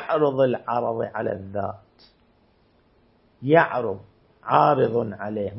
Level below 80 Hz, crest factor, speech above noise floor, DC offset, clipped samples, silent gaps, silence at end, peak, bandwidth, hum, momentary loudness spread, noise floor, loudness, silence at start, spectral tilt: -64 dBFS; 22 dB; 38 dB; under 0.1%; under 0.1%; none; 0 s; -2 dBFS; 5.8 kHz; none; 15 LU; -61 dBFS; -23 LUFS; 0 s; -11 dB/octave